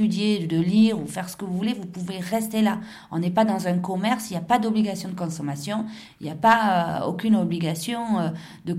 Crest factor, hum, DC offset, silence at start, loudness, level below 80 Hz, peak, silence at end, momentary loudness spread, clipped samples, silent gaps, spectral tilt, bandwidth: 20 dB; none; under 0.1%; 0 s; -24 LUFS; -64 dBFS; -4 dBFS; 0 s; 12 LU; under 0.1%; none; -6 dB/octave; 15.5 kHz